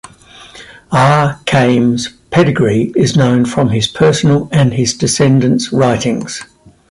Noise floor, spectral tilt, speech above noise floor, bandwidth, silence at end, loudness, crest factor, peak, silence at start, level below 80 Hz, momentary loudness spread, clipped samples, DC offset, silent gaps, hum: -38 dBFS; -5.5 dB/octave; 27 dB; 11.5 kHz; 0.45 s; -12 LUFS; 12 dB; 0 dBFS; 0.4 s; -42 dBFS; 6 LU; under 0.1%; under 0.1%; none; none